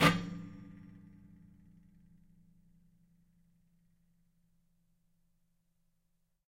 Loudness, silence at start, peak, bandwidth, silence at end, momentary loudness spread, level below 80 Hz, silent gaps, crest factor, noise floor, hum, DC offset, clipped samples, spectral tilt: -36 LUFS; 0 s; -12 dBFS; 15 kHz; 5.55 s; 25 LU; -62 dBFS; none; 28 dB; -77 dBFS; none; under 0.1%; under 0.1%; -5 dB/octave